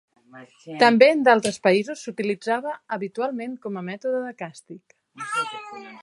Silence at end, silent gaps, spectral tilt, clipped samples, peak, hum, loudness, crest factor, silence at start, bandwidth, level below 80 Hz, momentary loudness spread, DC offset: 0.05 s; none; -4.5 dB/octave; under 0.1%; -2 dBFS; none; -22 LUFS; 22 dB; 0.35 s; 11.5 kHz; -74 dBFS; 21 LU; under 0.1%